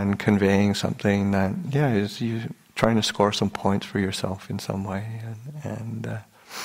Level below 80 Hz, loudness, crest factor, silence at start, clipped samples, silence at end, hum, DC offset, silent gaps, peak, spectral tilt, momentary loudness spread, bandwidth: -54 dBFS; -25 LUFS; 24 dB; 0 s; under 0.1%; 0 s; none; under 0.1%; none; -2 dBFS; -6 dB/octave; 13 LU; 16 kHz